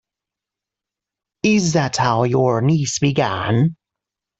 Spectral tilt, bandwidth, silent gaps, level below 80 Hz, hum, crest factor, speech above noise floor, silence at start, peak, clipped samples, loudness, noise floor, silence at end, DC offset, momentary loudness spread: -5.5 dB/octave; 8.2 kHz; none; -54 dBFS; none; 16 dB; 70 dB; 1.45 s; -4 dBFS; under 0.1%; -18 LUFS; -86 dBFS; 0.65 s; under 0.1%; 3 LU